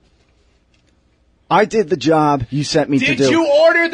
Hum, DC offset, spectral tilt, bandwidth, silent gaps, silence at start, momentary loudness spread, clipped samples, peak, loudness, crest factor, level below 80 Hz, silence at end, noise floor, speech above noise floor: 60 Hz at -45 dBFS; under 0.1%; -5 dB/octave; 10 kHz; none; 1.5 s; 6 LU; under 0.1%; -2 dBFS; -14 LUFS; 14 dB; -48 dBFS; 0 s; -57 dBFS; 43 dB